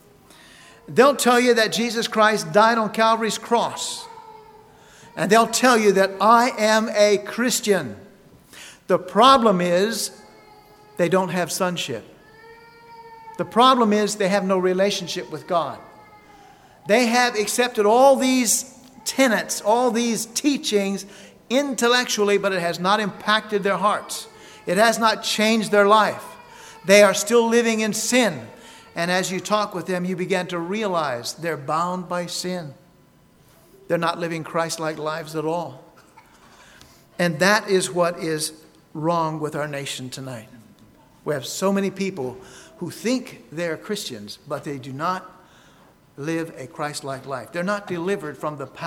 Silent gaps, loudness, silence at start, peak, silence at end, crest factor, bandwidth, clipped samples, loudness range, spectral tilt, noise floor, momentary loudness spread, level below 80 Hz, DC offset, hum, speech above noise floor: none; -20 LUFS; 0.9 s; 0 dBFS; 0 s; 22 dB; 17.5 kHz; under 0.1%; 10 LU; -3.5 dB/octave; -55 dBFS; 16 LU; -64 dBFS; under 0.1%; none; 34 dB